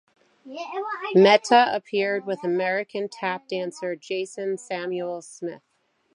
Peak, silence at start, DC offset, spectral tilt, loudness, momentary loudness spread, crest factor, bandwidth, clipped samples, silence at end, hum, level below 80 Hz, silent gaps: -4 dBFS; 0.45 s; under 0.1%; -4.5 dB/octave; -24 LUFS; 17 LU; 22 dB; 11 kHz; under 0.1%; 0.6 s; none; -82 dBFS; none